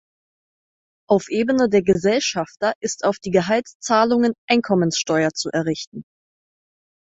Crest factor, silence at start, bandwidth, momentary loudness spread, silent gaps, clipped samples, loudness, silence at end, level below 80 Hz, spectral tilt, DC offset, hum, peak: 18 dB; 1.1 s; 8.2 kHz; 6 LU; 2.75-2.81 s, 3.75-3.80 s, 4.38-4.48 s, 5.87-5.92 s; under 0.1%; -20 LUFS; 1 s; -56 dBFS; -4.5 dB/octave; under 0.1%; none; -2 dBFS